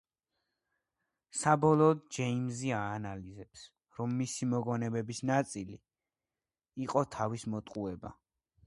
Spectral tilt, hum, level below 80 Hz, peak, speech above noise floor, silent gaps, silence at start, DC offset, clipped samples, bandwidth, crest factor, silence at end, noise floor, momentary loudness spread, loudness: -6 dB/octave; none; -66 dBFS; -12 dBFS; over 57 dB; none; 1.35 s; under 0.1%; under 0.1%; 11.5 kHz; 22 dB; 0.55 s; under -90 dBFS; 22 LU; -33 LUFS